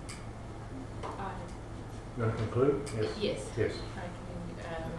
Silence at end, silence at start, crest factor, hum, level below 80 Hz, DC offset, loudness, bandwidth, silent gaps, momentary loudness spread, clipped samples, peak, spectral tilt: 0 s; 0 s; 20 dB; none; -48 dBFS; under 0.1%; -36 LUFS; 12 kHz; none; 14 LU; under 0.1%; -16 dBFS; -6.5 dB/octave